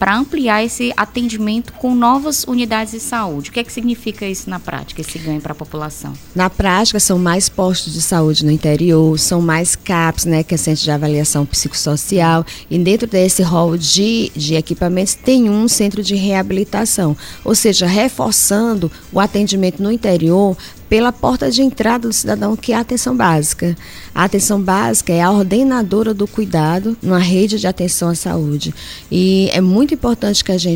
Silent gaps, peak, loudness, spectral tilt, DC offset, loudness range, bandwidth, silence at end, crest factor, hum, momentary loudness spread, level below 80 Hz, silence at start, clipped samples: none; 0 dBFS; -14 LUFS; -4.5 dB/octave; under 0.1%; 4 LU; 16.5 kHz; 0 s; 14 dB; none; 9 LU; -38 dBFS; 0 s; under 0.1%